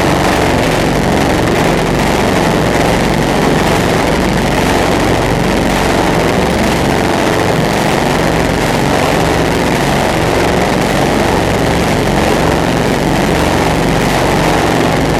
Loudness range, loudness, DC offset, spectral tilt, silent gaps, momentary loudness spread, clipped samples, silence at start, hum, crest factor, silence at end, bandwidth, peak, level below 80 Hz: 0 LU; -11 LUFS; under 0.1%; -5 dB/octave; none; 1 LU; under 0.1%; 0 s; none; 10 dB; 0 s; 16.5 kHz; 0 dBFS; -24 dBFS